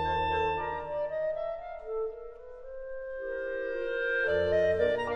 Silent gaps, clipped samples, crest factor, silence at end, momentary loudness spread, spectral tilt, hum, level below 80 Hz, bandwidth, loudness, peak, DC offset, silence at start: none; under 0.1%; 16 dB; 0 s; 16 LU; -6 dB/octave; none; -52 dBFS; 9 kHz; -31 LUFS; -14 dBFS; under 0.1%; 0 s